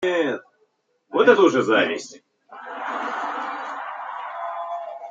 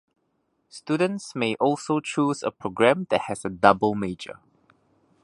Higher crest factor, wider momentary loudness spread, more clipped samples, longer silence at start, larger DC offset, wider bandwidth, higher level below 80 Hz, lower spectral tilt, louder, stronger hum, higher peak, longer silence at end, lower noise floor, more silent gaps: about the same, 22 dB vs 24 dB; first, 16 LU vs 12 LU; neither; second, 0 s vs 0.75 s; neither; second, 7.8 kHz vs 11.5 kHz; second, -74 dBFS vs -60 dBFS; about the same, -4.5 dB/octave vs -5.5 dB/octave; about the same, -23 LUFS vs -24 LUFS; neither; about the same, -2 dBFS vs -2 dBFS; second, 0 s vs 0.9 s; second, -67 dBFS vs -72 dBFS; neither